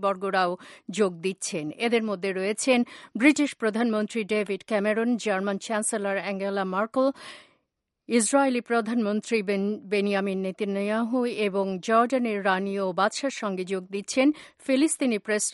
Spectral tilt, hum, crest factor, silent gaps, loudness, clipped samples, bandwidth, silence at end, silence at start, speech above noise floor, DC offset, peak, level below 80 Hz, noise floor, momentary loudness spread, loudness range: -4 dB/octave; none; 20 dB; none; -26 LUFS; under 0.1%; 11.5 kHz; 0 s; 0 s; 54 dB; under 0.1%; -6 dBFS; -76 dBFS; -79 dBFS; 7 LU; 2 LU